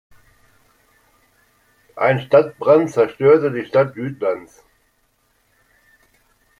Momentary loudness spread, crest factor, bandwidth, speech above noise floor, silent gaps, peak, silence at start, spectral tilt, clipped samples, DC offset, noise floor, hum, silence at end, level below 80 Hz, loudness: 9 LU; 18 dB; 10.5 kHz; 47 dB; none; -2 dBFS; 1.95 s; -7.5 dB/octave; under 0.1%; under 0.1%; -63 dBFS; none; 2.15 s; -62 dBFS; -17 LUFS